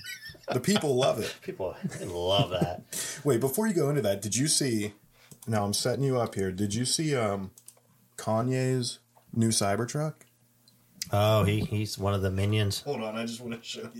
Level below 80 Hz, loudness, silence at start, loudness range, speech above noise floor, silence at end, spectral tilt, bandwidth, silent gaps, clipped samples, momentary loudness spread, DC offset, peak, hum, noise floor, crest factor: -62 dBFS; -28 LUFS; 0 s; 3 LU; 35 dB; 0 s; -4.5 dB/octave; 17 kHz; none; under 0.1%; 12 LU; under 0.1%; -10 dBFS; none; -63 dBFS; 18 dB